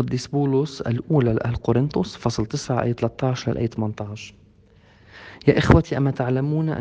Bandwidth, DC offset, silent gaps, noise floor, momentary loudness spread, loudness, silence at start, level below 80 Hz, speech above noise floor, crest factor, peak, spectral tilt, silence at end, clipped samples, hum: 8.8 kHz; under 0.1%; none; -53 dBFS; 11 LU; -22 LUFS; 0 s; -40 dBFS; 32 dB; 22 dB; 0 dBFS; -7 dB/octave; 0 s; under 0.1%; none